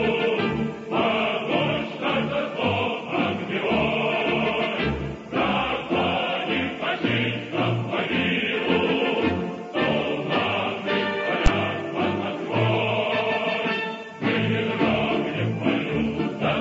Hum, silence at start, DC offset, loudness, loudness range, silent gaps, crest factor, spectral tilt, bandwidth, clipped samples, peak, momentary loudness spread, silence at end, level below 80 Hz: none; 0 s; under 0.1%; -24 LUFS; 1 LU; none; 18 dB; -6.5 dB/octave; 8 kHz; under 0.1%; -6 dBFS; 4 LU; 0 s; -40 dBFS